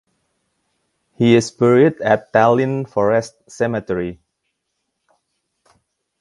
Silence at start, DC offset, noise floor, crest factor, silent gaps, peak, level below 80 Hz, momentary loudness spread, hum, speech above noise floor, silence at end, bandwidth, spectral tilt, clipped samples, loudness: 1.2 s; under 0.1%; -74 dBFS; 20 dB; none; 0 dBFS; -54 dBFS; 10 LU; none; 58 dB; 2.05 s; 11.5 kHz; -6.5 dB/octave; under 0.1%; -16 LUFS